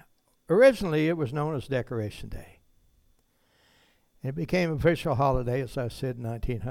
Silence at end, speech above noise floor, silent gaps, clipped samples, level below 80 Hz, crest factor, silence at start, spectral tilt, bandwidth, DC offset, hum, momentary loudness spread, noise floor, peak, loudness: 0 s; 41 dB; none; under 0.1%; -44 dBFS; 20 dB; 0.5 s; -7 dB/octave; 15.5 kHz; under 0.1%; none; 16 LU; -67 dBFS; -8 dBFS; -27 LUFS